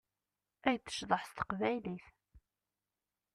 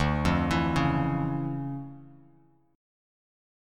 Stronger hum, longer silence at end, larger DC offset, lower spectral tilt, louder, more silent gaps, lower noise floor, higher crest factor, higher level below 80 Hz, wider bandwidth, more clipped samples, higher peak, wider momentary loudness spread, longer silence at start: neither; about the same, 0.95 s vs 1 s; neither; second, -4.5 dB/octave vs -7 dB/octave; second, -37 LUFS vs -28 LUFS; neither; first, under -90 dBFS vs -61 dBFS; first, 24 dB vs 18 dB; second, -68 dBFS vs -42 dBFS; about the same, 13.5 kHz vs 13 kHz; neither; second, -16 dBFS vs -10 dBFS; second, 7 LU vs 12 LU; first, 0.65 s vs 0 s